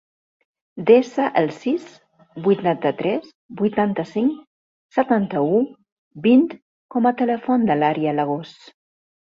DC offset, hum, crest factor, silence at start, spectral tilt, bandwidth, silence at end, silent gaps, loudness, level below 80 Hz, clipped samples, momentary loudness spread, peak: under 0.1%; none; 18 dB; 0.75 s; -8 dB/octave; 7.4 kHz; 0.85 s; 3.35-3.49 s, 4.47-4.89 s, 5.92-6.11 s, 6.62-6.89 s; -20 LUFS; -64 dBFS; under 0.1%; 12 LU; -2 dBFS